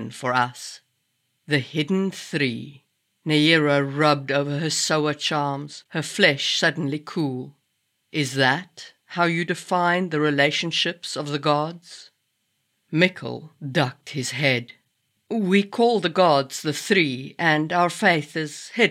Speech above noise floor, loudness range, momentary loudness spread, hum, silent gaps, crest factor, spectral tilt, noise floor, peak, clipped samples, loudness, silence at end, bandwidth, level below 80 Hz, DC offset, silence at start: 50 dB; 5 LU; 12 LU; none; none; 20 dB; -4.5 dB/octave; -73 dBFS; -4 dBFS; under 0.1%; -22 LUFS; 0 s; 16 kHz; -80 dBFS; under 0.1%; 0 s